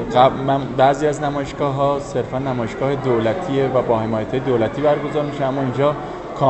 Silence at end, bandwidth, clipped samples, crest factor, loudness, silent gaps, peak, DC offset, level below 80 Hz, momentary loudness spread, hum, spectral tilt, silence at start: 0 s; 8.4 kHz; under 0.1%; 18 dB; -19 LUFS; none; 0 dBFS; under 0.1%; -44 dBFS; 7 LU; none; -7 dB/octave; 0 s